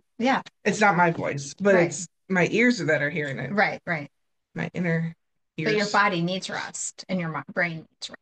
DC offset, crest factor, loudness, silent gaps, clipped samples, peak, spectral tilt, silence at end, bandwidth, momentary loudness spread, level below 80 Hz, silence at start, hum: under 0.1%; 18 dB; -25 LUFS; none; under 0.1%; -8 dBFS; -5 dB/octave; 0.05 s; 9.6 kHz; 12 LU; -70 dBFS; 0.2 s; none